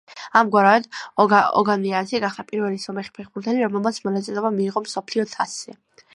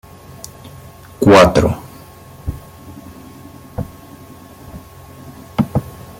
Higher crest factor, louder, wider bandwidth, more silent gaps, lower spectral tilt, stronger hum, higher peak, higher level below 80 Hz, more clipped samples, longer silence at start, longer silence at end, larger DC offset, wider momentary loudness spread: about the same, 20 dB vs 18 dB; second, -21 LUFS vs -14 LUFS; second, 11.5 kHz vs 17 kHz; neither; about the same, -5 dB/octave vs -6 dB/octave; neither; about the same, -2 dBFS vs 0 dBFS; second, -70 dBFS vs -38 dBFS; neither; second, 0.1 s vs 0.65 s; about the same, 0.4 s vs 0.3 s; neither; second, 14 LU vs 28 LU